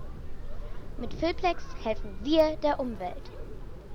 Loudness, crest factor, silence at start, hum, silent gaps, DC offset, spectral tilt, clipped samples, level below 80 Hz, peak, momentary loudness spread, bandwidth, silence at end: -30 LUFS; 18 dB; 0 s; none; none; under 0.1%; -6 dB/octave; under 0.1%; -40 dBFS; -12 dBFS; 20 LU; 16 kHz; 0 s